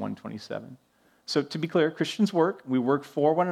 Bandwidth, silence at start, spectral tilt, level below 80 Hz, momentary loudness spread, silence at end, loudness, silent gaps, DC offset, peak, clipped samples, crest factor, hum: 13.5 kHz; 0 s; -6 dB/octave; -76 dBFS; 14 LU; 0 s; -27 LUFS; none; under 0.1%; -8 dBFS; under 0.1%; 18 dB; none